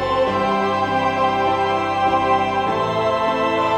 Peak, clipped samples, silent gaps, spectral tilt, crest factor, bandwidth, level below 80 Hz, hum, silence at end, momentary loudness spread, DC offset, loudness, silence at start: -6 dBFS; under 0.1%; none; -5.5 dB/octave; 12 dB; 12.5 kHz; -48 dBFS; none; 0 s; 2 LU; 0.1%; -19 LUFS; 0 s